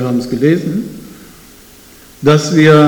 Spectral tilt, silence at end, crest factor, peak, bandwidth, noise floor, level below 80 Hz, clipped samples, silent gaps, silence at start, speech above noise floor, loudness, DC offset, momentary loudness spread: -6.5 dB/octave; 0 s; 12 dB; 0 dBFS; 19.5 kHz; -40 dBFS; -46 dBFS; under 0.1%; none; 0 s; 30 dB; -13 LUFS; under 0.1%; 21 LU